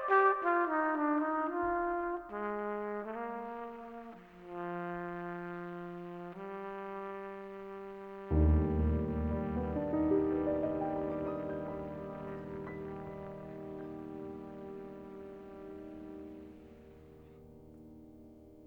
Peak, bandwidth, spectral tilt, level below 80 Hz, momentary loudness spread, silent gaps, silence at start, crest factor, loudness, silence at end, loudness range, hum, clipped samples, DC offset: -16 dBFS; 4.5 kHz; -10 dB/octave; -46 dBFS; 22 LU; none; 0 s; 22 dB; -36 LUFS; 0 s; 15 LU; none; under 0.1%; under 0.1%